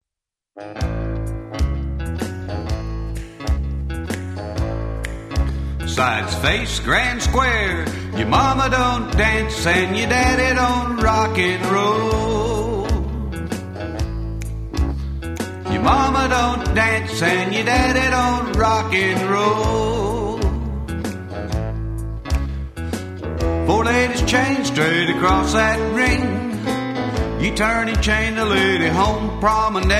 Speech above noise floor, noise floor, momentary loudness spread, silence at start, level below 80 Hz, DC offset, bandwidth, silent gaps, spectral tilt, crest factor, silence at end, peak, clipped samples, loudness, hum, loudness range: 68 dB; -86 dBFS; 11 LU; 0.55 s; -26 dBFS; under 0.1%; 15 kHz; none; -5 dB/octave; 18 dB; 0 s; -2 dBFS; under 0.1%; -19 LUFS; none; 8 LU